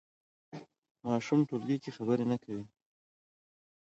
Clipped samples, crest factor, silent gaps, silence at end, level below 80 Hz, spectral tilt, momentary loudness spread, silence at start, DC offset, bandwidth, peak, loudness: under 0.1%; 18 dB; 0.78-0.82 s, 0.91-0.95 s; 1.15 s; -76 dBFS; -7.5 dB/octave; 20 LU; 0.55 s; under 0.1%; 8 kHz; -16 dBFS; -33 LUFS